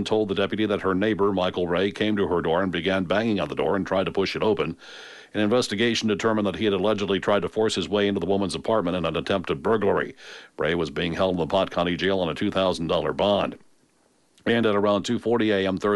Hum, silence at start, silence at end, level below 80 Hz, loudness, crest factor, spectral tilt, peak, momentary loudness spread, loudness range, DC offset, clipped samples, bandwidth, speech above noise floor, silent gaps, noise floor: none; 0 s; 0 s; -54 dBFS; -24 LUFS; 14 dB; -5.5 dB/octave; -10 dBFS; 4 LU; 1 LU; under 0.1%; under 0.1%; 11.5 kHz; 40 dB; none; -64 dBFS